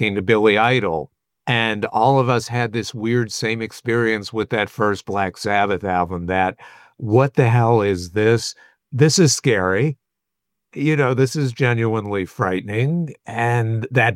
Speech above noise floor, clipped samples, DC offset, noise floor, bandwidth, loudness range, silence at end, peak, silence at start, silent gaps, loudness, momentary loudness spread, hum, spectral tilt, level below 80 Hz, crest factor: 63 dB; under 0.1%; under 0.1%; -82 dBFS; 14.5 kHz; 3 LU; 0 s; -2 dBFS; 0 s; none; -19 LUFS; 9 LU; none; -5.5 dB/octave; -54 dBFS; 16 dB